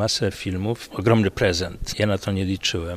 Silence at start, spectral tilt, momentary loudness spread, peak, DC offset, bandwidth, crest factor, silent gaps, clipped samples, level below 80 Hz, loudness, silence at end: 0 s; -5 dB/octave; 8 LU; -4 dBFS; under 0.1%; 15.5 kHz; 18 dB; none; under 0.1%; -42 dBFS; -23 LUFS; 0 s